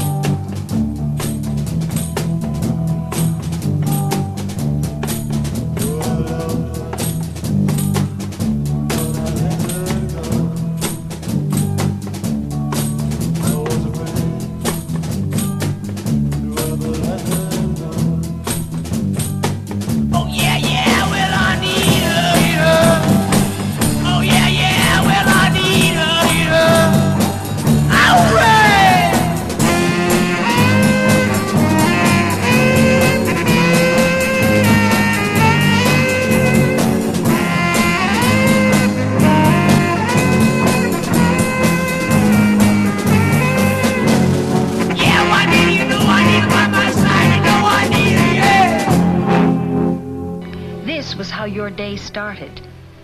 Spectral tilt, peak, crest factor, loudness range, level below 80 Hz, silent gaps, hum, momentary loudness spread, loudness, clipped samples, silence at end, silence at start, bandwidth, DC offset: -5 dB/octave; -2 dBFS; 14 dB; 8 LU; -34 dBFS; none; none; 10 LU; -15 LUFS; under 0.1%; 0.15 s; 0 s; 14 kHz; under 0.1%